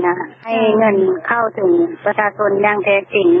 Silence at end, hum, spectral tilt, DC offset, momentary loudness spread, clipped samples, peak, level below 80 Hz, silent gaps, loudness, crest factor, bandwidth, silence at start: 0 s; none; -10 dB/octave; under 0.1%; 4 LU; under 0.1%; -2 dBFS; -64 dBFS; none; -15 LUFS; 12 dB; 3.8 kHz; 0 s